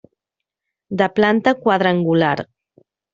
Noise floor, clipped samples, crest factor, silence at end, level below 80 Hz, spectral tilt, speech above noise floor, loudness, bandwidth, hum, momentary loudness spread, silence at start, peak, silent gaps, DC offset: -84 dBFS; under 0.1%; 18 dB; 0.7 s; -58 dBFS; -4.5 dB/octave; 67 dB; -17 LUFS; 7.6 kHz; none; 11 LU; 0.9 s; -2 dBFS; none; under 0.1%